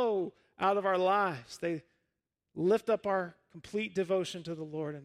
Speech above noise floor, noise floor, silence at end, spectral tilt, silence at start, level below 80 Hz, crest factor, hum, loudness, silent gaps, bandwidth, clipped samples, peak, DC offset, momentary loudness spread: 54 dB; -86 dBFS; 0 s; -6 dB/octave; 0 s; -74 dBFS; 18 dB; none; -32 LUFS; none; 13.5 kHz; under 0.1%; -14 dBFS; under 0.1%; 12 LU